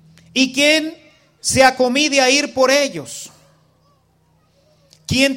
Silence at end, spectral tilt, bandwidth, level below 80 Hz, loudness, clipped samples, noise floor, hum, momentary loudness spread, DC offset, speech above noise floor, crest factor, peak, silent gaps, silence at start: 0 s; -2.5 dB/octave; 16.5 kHz; -50 dBFS; -15 LUFS; under 0.1%; -58 dBFS; none; 18 LU; under 0.1%; 43 dB; 18 dB; 0 dBFS; none; 0.35 s